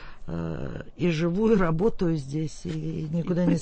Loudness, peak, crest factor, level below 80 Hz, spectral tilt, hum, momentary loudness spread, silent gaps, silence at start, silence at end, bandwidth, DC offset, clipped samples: -27 LUFS; -10 dBFS; 16 dB; -40 dBFS; -7.5 dB/octave; none; 11 LU; none; 0 s; 0 s; 8.6 kHz; under 0.1%; under 0.1%